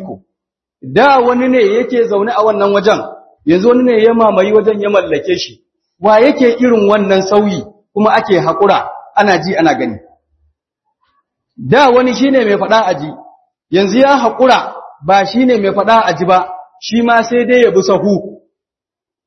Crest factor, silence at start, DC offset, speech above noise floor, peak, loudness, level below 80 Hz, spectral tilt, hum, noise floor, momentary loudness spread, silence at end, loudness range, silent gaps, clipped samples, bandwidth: 12 dB; 0 s; under 0.1%; 76 dB; 0 dBFS; -11 LUFS; -52 dBFS; -5.5 dB/octave; none; -86 dBFS; 9 LU; 0.9 s; 3 LU; none; 0.1%; 6.4 kHz